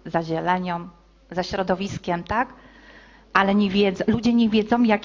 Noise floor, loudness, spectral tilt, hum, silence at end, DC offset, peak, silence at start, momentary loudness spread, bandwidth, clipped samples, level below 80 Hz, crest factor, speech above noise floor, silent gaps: -48 dBFS; -22 LUFS; -6.5 dB/octave; none; 0 s; under 0.1%; -2 dBFS; 0.05 s; 10 LU; 7.4 kHz; under 0.1%; -48 dBFS; 20 dB; 27 dB; none